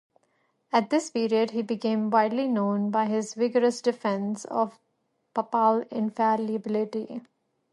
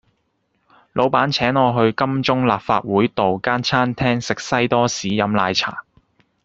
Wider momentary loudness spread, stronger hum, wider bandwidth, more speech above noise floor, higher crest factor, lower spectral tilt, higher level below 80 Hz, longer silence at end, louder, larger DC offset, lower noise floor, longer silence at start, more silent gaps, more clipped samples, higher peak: first, 8 LU vs 4 LU; neither; first, 11.5 kHz vs 8 kHz; about the same, 49 dB vs 50 dB; about the same, 18 dB vs 16 dB; about the same, -5.5 dB/octave vs -5 dB/octave; second, -78 dBFS vs -52 dBFS; second, 0.5 s vs 0.65 s; second, -26 LUFS vs -18 LUFS; neither; first, -75 dBFS vs -68 dBFS; second, 0.75 s vs 0.95 s; neither; neither; second, -8 dBFS vs -2 dBFS